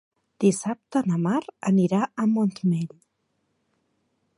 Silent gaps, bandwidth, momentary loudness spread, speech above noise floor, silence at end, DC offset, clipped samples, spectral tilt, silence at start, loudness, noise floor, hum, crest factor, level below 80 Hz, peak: none; 11.5 kHz; 6 LU; 51 dB; 1.5 s; under 0.1%; under 0.1%; -7 dB/octave; 0.4 s; -24 LUFS; -74 dBFS; none; 18 dB; -72 dBFS; -8 dBFS